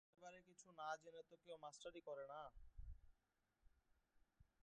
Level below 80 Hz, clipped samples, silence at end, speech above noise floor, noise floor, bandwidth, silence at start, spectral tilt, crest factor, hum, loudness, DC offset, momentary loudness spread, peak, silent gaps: -70 dBFS; under 0.1%; 0.15 s; 32 dB; -88 dBFS; 9.4 kHz; 0.15 s; -3.5 dB/octave; 22 dB; none; -58 LUFS; under 0.1%; 13 LU; -38 dBFS; none